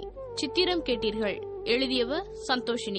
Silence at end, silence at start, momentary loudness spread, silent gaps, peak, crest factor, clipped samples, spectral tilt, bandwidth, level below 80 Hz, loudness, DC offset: 0 s; 0 s; 8 LU; none; -12 dBFS; 18 dB; under 0.1%; -3.5 dB/octave; 8.8 kHz; -50 dBFS; -28 LUFS; under 0.1%